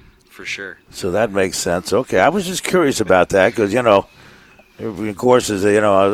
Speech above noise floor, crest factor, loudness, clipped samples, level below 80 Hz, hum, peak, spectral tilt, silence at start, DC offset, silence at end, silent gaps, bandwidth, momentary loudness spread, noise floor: 30 dB; 16 dB; -16 LUFS; under 0.1%; -48 dBFS; none; 0 dBFS; -4.5 dB/octave; 0.4 s; under 0.1%; 0 s; none; 16 kHz; 14 LU; -46 dBFS